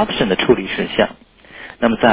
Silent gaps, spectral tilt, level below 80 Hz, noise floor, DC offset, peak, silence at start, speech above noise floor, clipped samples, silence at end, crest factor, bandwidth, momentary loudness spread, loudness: none; -9.5 dB/octave; -44 dBFS; -38 dBFS; under 0.1%; 0 dBFS; 0 s; 22 dB; under 0.1%; 0 s; 16 dB; 4 kHz; 13 LU; -17 LUFS